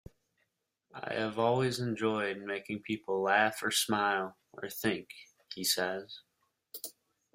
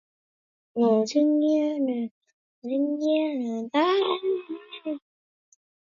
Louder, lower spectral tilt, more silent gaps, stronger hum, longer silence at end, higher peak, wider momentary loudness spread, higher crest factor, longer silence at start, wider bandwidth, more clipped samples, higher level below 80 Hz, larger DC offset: second, -32 LUFS vs -25 LUFS; second, -3.5 dB/octave vs -5 dB/octave; second, none vs 2.11-2.21 s, 2.33-2.62 s; neither; second, 0.45 s vs 1 s; about the same, -12 dBFS vs -10 dBFS; first, 18 LU vs 14 LU; first, 22 dB vs 16 dB; first, 0.95 s vs 0.75 s; first, 16 kHz vs 7.4 kHz; neither; first, -72 dBFS vs -80 dBFS; neither